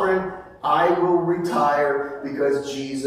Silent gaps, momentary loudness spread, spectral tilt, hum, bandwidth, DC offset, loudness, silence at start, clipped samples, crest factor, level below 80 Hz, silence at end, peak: none; 10 LU; -6 dB/octave; none; 15 kHz; under 0.1%; -21 LUFS; 0 s; under 0.1%; 14 dB; -56 dBFS; 0 s; -6 dBFS